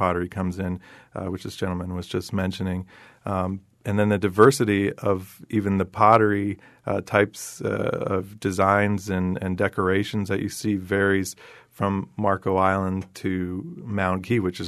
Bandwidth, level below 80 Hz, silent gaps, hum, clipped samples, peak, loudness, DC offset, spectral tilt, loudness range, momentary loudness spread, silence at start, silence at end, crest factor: 13.5 kHz; -56 dBFS; none; none; under 0.1%; -2 dBFS; -24 LUFS; under 0.1%; -6.5 dB/octave; 7 LU; 13 LU; 0 s; 0 s; 22 dB